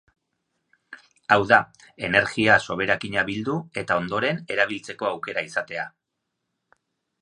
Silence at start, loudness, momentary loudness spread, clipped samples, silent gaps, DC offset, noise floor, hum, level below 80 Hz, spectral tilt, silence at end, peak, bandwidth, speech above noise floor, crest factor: 0.9 s; -23 LUFS; 13 LU; under 0.1%; none; under 0.1%; -80 dBFS; none; -58 dBFS; -5 dB/octave; 1.35 s; -2 dBFS; 11 kHz; 57 dB; 24 dB